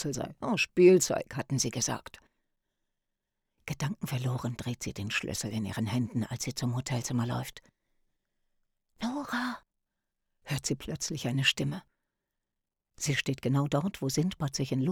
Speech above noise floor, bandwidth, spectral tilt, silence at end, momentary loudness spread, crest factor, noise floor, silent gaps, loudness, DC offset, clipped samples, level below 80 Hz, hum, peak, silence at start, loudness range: 57 dB; 18 kHz; -4.5 dB/octave; 0 s; 10 LU; 22 dB; -87 dBFS; none; -31 LUFS; under 0.1%; under 0.1%; -60 dBFS; none; -10 dBFS; 0 s; 9 LU